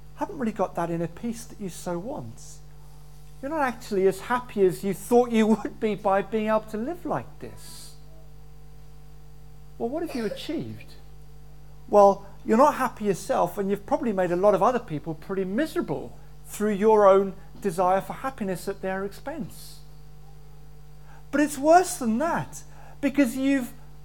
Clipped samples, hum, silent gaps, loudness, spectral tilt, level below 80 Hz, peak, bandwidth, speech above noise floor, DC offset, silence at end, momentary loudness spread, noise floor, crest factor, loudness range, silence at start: under 0.1%; none; none; -25 LUFS; -6 dB/octave; -50 dBFS; -4 dBFS; 19 kHz; 24 dB; 0.8%; 0.05 s; 19 LU; -48 dBFS; 22 dB; 12 LU; 0.05 s